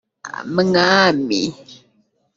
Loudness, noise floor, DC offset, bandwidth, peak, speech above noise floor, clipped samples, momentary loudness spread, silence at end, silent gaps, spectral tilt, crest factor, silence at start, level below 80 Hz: -16 LUFS; -62 dBFS; under 0.1%; 7.8 kHz; -2 dBFS; 45 dB; under 0.1%; 16 LU; 0.6 s; none; -4.5 dB/octave; 18 dB; 0.25 s; -58 dBFS